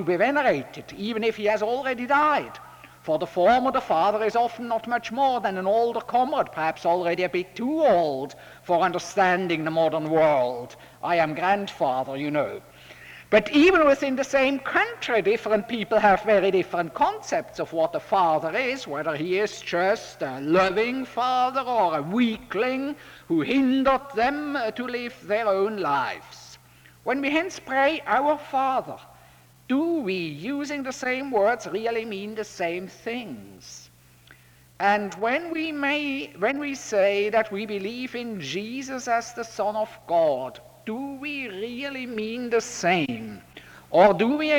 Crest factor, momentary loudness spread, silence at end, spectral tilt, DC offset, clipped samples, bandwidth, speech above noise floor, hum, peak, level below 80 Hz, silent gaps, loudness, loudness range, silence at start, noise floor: 20 dB; 12 LU; 0 s; -5 dB/octave; under 0.1%; under 0.1%; over 20 kHz; 29 dB; none; -6 dBFS; -60 dBFS; none; -24 LUFS; 6 LU; 0 s; -53 dBFS